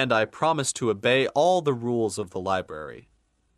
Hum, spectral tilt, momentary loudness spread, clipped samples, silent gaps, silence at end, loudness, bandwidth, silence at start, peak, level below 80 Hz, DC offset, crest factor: none; -4 dB/octave; 11 LU; under 0.1%; none; 0.55 s; -24 LUFS; 13.5 kHz; 0 s; -8 dBFS; -62 dBFS; under 0.1%; 16 dB